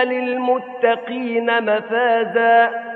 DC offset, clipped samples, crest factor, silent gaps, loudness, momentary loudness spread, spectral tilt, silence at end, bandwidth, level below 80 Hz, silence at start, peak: under 0.1%; under 0.1%; 16 dB; none; -18 LUFS; 7 LU; -7 dB/octave; 0 s; 4.5 kHz; -78 dBFS; 0 s; -2 dBFS